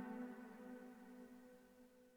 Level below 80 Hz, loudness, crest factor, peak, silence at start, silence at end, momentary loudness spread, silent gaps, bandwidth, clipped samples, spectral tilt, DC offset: -86 dBFS; -57 LUFS; 16 dB; -40 dBFS; 0 s; 0 s; 14 LU; none; over 20 kHz; under 0.1%; -6.5 dB/octave; under 0.1%